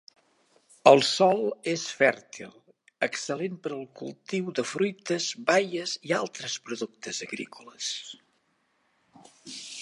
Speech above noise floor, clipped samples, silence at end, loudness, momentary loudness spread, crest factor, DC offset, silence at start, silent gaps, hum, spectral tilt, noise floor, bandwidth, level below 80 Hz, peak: 44 dB; under 0.1%; 0 s; -27 LUFS; 19 LU; 26 dB; under 0.1%; 0.85 s; none; none; -3.5 dB/octave; -71 dBFS; 11.5 kHz; -82 dBFS; -2 dBFS